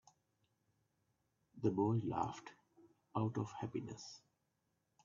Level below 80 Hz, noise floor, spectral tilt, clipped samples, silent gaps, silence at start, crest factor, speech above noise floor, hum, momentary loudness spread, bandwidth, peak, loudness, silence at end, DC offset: -76 dBFS; -84 dBFS; -8 dB/octave; under 0.1%; none; 1.55 s; 22 dB; 45 dB; none; 17 LU; 7.4 kHz; -22 dBFS; -41 LUFS; 0.85 s; under 0.1%